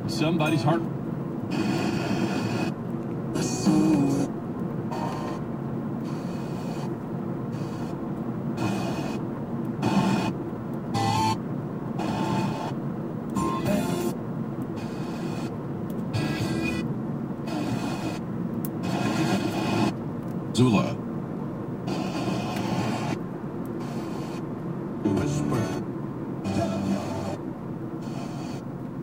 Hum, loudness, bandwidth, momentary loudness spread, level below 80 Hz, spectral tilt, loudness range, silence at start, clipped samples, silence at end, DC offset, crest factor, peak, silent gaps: none; -28 LUFS; 16 kHz; 9 LU; -54 dBFS; -6.5 dB/octave; 4 LU; 0 s; under 0.1%; 0 s; under 0.1%; 18 dB; -8 dBFS; none